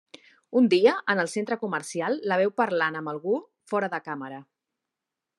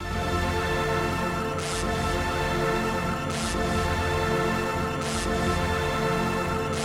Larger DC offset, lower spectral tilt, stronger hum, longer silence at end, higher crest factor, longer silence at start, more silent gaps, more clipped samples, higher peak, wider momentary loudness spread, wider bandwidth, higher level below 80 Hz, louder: second, under 0.1% vs 0.1%; about the same, -5 dB/octave vs -5 dB/octave; neither; first, 0.95 s vs 0 s; first, 20 dB vs 14 dB; first, 0.5 s vs 0 s; neither; neither; first, -8 dBFS vs -12 dBFS; first, 12 LU vs 3 LU; second, 12 kHz vs 16 kHz; second, -84 dBFS vs -38 dBFS; about the same, -26 LUFS vs -26 LUFS